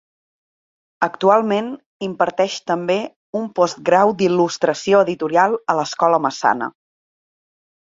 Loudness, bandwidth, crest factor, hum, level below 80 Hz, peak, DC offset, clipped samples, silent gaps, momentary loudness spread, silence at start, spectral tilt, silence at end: -18 LUFS; 7.8 kHz; 18 dB; none; -66 dBFS; -2 dBFS; under 0.1%; under 0.1%; 1.86-2.00 s, 3.16-3.33 s; 10 LU; 1 s; -5 dB/octave; 1.2 s